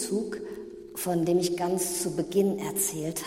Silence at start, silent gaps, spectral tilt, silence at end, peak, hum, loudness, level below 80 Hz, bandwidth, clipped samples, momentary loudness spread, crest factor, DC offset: 0 s; none; -4.5 dB/octave; 0 s; -12 dBFS; none; -28 LUFS; -62 dBFS; 16.5 kHz; under 0.1%; 12 LU; 16 dB; under 0.1%